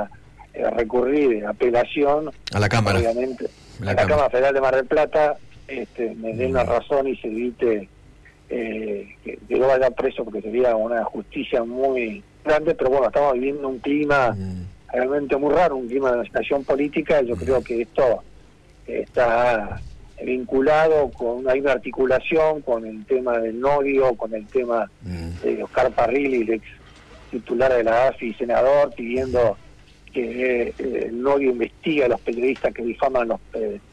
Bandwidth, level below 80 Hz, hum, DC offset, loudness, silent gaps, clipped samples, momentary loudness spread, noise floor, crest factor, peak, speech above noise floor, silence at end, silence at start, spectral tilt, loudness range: 11 kHz; -46 dBFS; none; under 0.1%; -21 LUFS; none; under 0.1%; 11 LU; -49 dBFS; 12 dB; -10 dBFS; 28 dB; 0.15 s; 0 s; -6.5 dB/octave; 3 LU